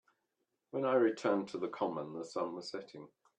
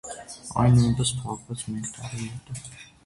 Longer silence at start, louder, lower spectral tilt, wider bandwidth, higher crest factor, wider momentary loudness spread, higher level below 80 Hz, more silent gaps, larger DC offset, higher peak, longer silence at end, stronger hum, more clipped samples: first, 0.75 s vs 0.05 s; second, -36 LUFS vs -25 LUFS; about the same, -6 dB/octave vs -5.5 dB/octave; second, 9.6 kHz vs 11.5 kHz; about the same, 20 dB vs 18 dB; second, 15 LU vs 18 LU; second, -86 dBFS vs -46 dBFS; neither; neither; second, -16 dBFS vs -10 dBFS; about the same, 0.3 s vs 0.2 s; neither; neither